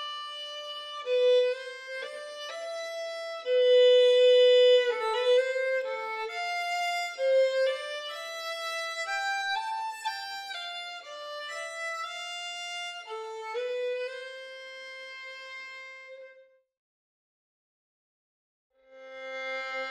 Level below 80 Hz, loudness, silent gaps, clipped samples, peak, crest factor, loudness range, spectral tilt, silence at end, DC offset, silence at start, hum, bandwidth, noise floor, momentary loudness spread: -84 dBFS; -28 LUFS; 16.77-18.70 s; under 0.1%; -14 dBFS; 16 dB; 20 LU; 2.5 dB/octave; 0 s; under 0.1%; 0 s; none; 12.5 kHz; -58 dBFS; 20 LU